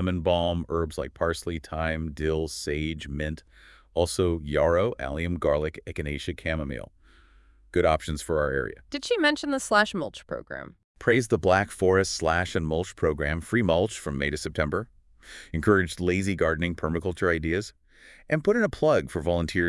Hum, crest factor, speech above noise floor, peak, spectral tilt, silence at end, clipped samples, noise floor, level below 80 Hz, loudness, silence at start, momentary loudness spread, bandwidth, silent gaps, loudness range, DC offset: none; 22 dB; 30 dB; -6 dBFS; -5.5 dB/octave; 0 s; under 0.1%; -56 dBFS; -44 dBFS; -26 LUFS; 0 s; 11 LU; 12 kHz; 10.84-10.95 s; 4 LU; under 0.1%